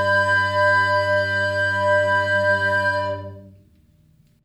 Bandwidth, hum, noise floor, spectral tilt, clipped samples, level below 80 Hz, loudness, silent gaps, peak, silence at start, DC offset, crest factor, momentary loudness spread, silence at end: 13 kHz; none; -56 dBFS; -4.5 dB/octave; under 0.1%; -62 dBFS; -19 LUFS; none; -8 dBFS; 0 s; under 0.1%; 12 dB; 7 LU; 0.95 s